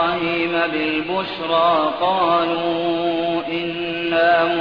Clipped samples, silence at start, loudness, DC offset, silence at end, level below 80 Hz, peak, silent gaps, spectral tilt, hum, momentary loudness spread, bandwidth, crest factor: under 0.1%; 0 s; -19 LUFS; 0.2%; 0 s; -54 dBFS; -6 dBFS; none; -7 dB/octave; none; 7 LU; 5.2 kHz; 14 dB